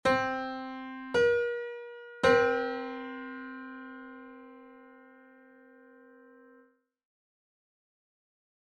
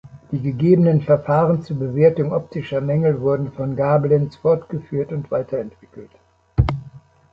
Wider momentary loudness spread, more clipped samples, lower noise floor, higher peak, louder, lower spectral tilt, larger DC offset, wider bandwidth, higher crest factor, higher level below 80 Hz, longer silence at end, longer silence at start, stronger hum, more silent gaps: first, 23 LU vs 10 LU; neither; first, -65 dBFS vs -43 dBFS; second, -12 dBFS vs -2 dBFS; second, -30 LUFS vs -19 LUFS; second, -4.5 dB/octave vs -10.5 dB/octave; neither; first, 10.5 kHz vs 5.6 kHz; about the same, 22 dB vs 18 dB; second, -66 dBFS vs -38 dBFS; first, 3.8 s vs 0.35 s; about the same, 0.05 s vs 0.05 s; neither; neither